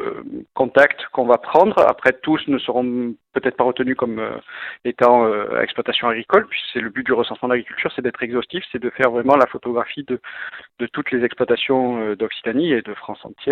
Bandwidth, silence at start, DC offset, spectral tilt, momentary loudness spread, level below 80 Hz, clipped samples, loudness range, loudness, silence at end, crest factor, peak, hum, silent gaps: 8 kHz; 0 s; under 0.1%; -6.5 dB/octave; 13 LU; -58 dBFS; under 0.1%; 4 LU; -19 LUFS; 0 s; 20 dB; 0 dBFS; none; none